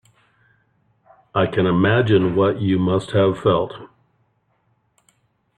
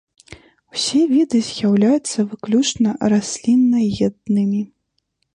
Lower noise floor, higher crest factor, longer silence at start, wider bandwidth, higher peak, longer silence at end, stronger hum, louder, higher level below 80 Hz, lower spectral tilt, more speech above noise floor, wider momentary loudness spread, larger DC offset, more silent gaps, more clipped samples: second, -65 dBFS vs -70 dBFS; about the same, 16 dB vs 12 dB; first, 1.35 s vs 0.75 s; about the same, 9.6 kHz vs 10.5 kHz; about the same, -4 dBFS vs -6 dBFS; first, 1.7 s vs 0.7 s; neither; about the same, -19 LUFS vs -18 LUFS; about the same, -52 dBFS vs -54 dBFS; first, -8 dB/octave vs -5 dB/octave; second, 48 dB vs 54 dB; about the same, 7 LU vs 7 LU; neither; neither; neither